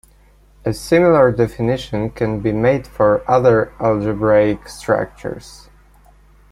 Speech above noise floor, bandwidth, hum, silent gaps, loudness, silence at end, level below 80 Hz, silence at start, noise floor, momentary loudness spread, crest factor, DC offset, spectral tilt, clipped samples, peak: 34 dB; 13.5 kHz; 50 Hz at -40 dBFS; none; -16 LUFS; 0.95 s; -42 dBFS; 0.65 s; -50 dBFS; 13 LU; 16 dB; under 0.1%; -7 dB/octave; under 0.1%; -2 dBFS